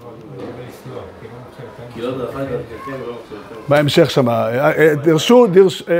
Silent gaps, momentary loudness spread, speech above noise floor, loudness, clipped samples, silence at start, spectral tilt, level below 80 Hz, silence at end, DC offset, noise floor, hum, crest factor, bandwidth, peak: none; 23 LU; 21 dB; -14 LUFS; under 0.1%; 0 s; -6 dB/octave; -52 dBFS; 0 s; under 0.1%; -35 dBFS; none; 16 dB; 16 kHz; 0 dBFS